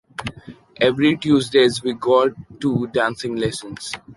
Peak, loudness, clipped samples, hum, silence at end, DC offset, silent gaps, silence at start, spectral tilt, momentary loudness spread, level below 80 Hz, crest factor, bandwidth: -4 dBFS; -19 LUFS; under 0.1%; none; 0.05 s; under 0.1%; none; 0.2 s; -5 dB/octave; 14 LU; -52 dBFS; 16 dB; 11.5 kHz